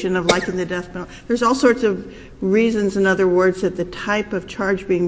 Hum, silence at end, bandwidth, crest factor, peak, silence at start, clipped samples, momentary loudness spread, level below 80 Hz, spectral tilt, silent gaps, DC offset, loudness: none; 0 s; 8 kHz; 18 dB; 0 dBFS; 0 s; under 0.1%; 11 LU; -46 dBFS; -5.5 dB/octave; none; under 0.1%; -19 LUFS